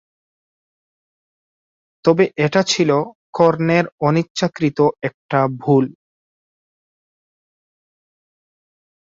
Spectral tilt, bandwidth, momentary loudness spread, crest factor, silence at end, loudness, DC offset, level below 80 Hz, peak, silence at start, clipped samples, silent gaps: -5.5 dB/octave; 7.8 kHz; 5 LU; 18 dB; 3.2 s; -17 LUFS; under 0.1%; -60 dBFS; -2 dBFS; 2.05 s; under 0.1%; 3.15-3.33 s, 3.92-3.98 s, 4.30-4.35 s, 5.14-5.29 s